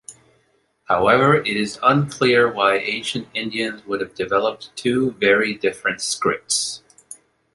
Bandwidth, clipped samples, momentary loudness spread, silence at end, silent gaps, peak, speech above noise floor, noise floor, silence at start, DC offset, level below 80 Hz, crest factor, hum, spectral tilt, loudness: 11.5 kHz; under 0.1%; 10 LU; 0.4 s; none; -2 dBFS; 44 dB; -64 dBFS; 0.1 s; under 0.1%; -56 dBFS; 18 dB; none; -4 dB/octave; -19 LUFS